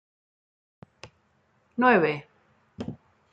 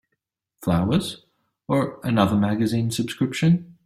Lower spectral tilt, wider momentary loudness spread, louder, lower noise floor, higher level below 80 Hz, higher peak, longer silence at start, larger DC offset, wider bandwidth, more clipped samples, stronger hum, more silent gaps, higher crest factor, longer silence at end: about the same, -7 dB/octave vs -6.5 dB/octave; first, 19 LU vs 6 LU; about the same, -23 LUFS vs -23 LUFS; second, -67 dBFS vs -79 dBFS; second, -68 dBFS vs -54 dBFS; second, -8 dBFS vs -4 dBFS; first, 1.05 s vs 0.6 s; neither; second, 7.6 kHz vs 15.5 kHz; neither; neither; neither; about the same, 22 dB vs 18 dB; first, 0.4 s vs 0.15 s